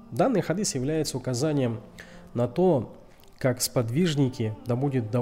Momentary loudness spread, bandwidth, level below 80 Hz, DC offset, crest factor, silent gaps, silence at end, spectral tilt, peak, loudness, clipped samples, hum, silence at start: 10 LU; 16 kHz; -52 dBFS; under 0.1%; 14 dB; none; 0 s; -5.5 dB/octave; -12 dBFS; -26 LUFS; under 0.1%; none; 0 s